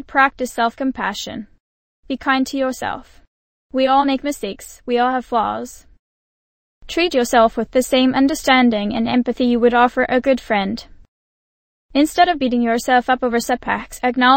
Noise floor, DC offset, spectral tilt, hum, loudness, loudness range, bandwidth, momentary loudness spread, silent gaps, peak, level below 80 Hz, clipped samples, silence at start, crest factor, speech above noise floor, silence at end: under -90 dBFS; under 0.1%; -4 dB/octave; none; -18 LUFS; 6 LU; 16.5 kHz; 12 LU; 1.60-2.03 s, 3.27-3.70 s, 5.99-6.81 s, 11.08-11.89 s; 0 dBFS; -46 dBFS; under 0.1%; 0 s; 18 dB; over 73 dB; 0 s